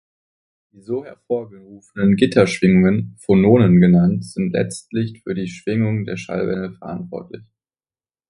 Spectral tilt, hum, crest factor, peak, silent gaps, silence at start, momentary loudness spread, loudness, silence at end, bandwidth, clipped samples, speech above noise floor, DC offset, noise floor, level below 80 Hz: -7.5 dB/octave; none; 18 dB; 0 dBFS; none; 0.9 s; 17 LU; -18 LUFS; 0.9 s; 11.5 kHz; under 0.1%; over 72 dB; under 0.1%; under -90 dBFS; -48 dBFS